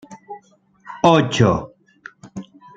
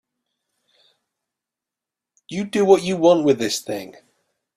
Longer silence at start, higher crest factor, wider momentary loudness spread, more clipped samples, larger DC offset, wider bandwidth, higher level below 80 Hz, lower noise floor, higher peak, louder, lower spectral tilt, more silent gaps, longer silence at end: second, 0.1 s vs 2.3 s; about the same, 20 dB vs 20 dB; first, 25 LU vs 16 LU; neither; neither; second, 9 kHz vs 14.5 kHz; first, -50 dBFS vs -64 dBFS; second, -53 dBFS vs -87 dBFS; about the same, -2 dBFS vs -2 dBFS; about the same, -17 LUFS vs -19 LUFS; about the same, -6 dB/octave vs -5 dB/octave; neither; second, 0.35 s vs 0.65 s